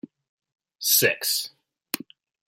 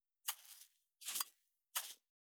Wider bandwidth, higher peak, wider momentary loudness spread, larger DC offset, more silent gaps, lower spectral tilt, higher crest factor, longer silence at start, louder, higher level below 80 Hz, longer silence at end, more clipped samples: second, 16.5 kHz vs over 20 kHz; first, -4 dBFS vs -22 dBFS; second, 14 LU vs 18 LU; neither; neither; first, -1 dB/octave vs 4 dB/octave; about the same, 24 dB vs 28 dB; first, 0.8 s vs 0.25 s; first, -23 LUFS vs -46 LUFS; first, -76 dBFS vs under -90 dBFS; first, 0.55 s vs 0.35 s; neither